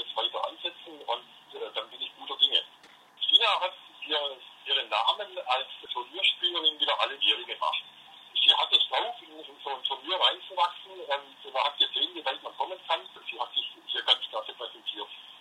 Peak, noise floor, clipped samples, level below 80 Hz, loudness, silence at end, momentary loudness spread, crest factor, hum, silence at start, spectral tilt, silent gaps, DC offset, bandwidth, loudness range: -6 dBFS; -55 dBFS; under 0.1%; under -90 dBFS; -27 LUFS; 0 s; 16 LU; 24 dB; none; 0 s; 0 dB/octave; none; under 0.1%; 14 kHz; 5 LU